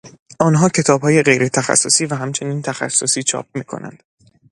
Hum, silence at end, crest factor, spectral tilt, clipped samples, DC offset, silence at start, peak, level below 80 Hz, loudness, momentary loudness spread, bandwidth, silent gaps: none; 0.6 s; 18 dB; -4 dB/octave; under 0.1%; under 0.1%; 0.05 s; 0 dBFS; -58 dBFS; -15 LUFS; 14 LU; 11.5 kHz; 0.19-0.26 s